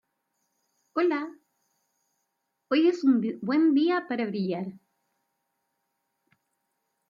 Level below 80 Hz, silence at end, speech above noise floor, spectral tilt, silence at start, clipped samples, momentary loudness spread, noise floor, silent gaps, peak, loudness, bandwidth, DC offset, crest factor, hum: -82 dBFS; 2.3 s; 55 dB; -7 dB/octave; 0.95 s; under 0.1%; 12 LU; -80 dBFS; none; -12 dBFS; -26 LUFS; 7.4 kHz; under 0.1%; 16 dB; none